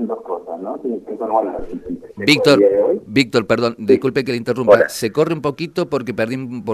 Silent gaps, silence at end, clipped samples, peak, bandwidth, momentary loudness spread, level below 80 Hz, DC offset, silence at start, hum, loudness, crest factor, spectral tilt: none; 0 s; under 0.1%; 0 dBFS; 13.5 kHz; 14 LU; -48 dBFS; under 0.1%; 0 s; none; -17 LUFS; 16 dB; -5.5 dB/octave